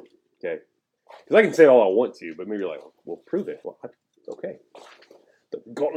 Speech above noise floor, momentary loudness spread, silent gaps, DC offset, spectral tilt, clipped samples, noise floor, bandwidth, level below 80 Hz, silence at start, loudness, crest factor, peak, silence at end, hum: 33 dB; 24 LU; none; under 0.1%; -6 dB/octave; under 0.1%; -55 dBFS; 9.4 kHz; -82 dBFS; 0.45 s; -21 LUFS; 22 dB; -2 dBFS; 0 s; none